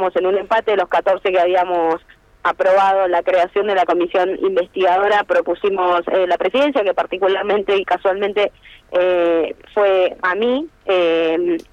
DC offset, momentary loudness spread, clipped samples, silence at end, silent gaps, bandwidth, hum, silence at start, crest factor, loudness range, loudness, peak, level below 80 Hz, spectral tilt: under 0.1%; 5 LU; under 0.1%; 0.1 s; none; 8.4 kHz; none; 0 s; 10 dB; 2 LU; -17 LUFS; -6 dBFS; -54 dBFS; -5 dB/octave